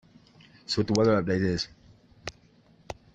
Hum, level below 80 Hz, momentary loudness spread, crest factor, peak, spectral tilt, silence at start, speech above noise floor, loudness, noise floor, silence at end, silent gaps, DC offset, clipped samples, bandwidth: none; -56 dBFS; 21 LU; 20 dB; -10 dBFS; -5.5 dB/octave; 0.7 s; 34 dB; -26 LUFS; -59 dBFS; 0.2 s; none; under 0.1%; under 0.1%; 9 kHz